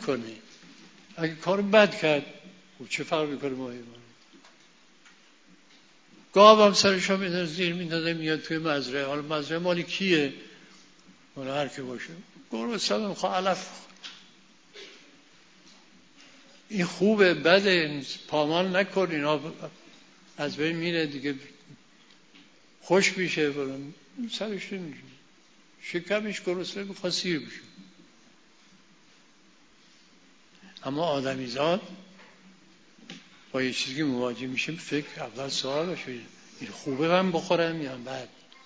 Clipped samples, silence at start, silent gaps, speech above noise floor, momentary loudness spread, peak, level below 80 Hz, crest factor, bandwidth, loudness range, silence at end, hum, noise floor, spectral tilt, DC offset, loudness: under 0.1%; 0 s; none; 33 dB; 22 LU; -2 dBFS; -72 dBFS; 28 dB; 8 kHz; 13 LU; 0.4 s; none; -60 dBFS; -4.5 dB/octave; under 0.1%; -26 LUFS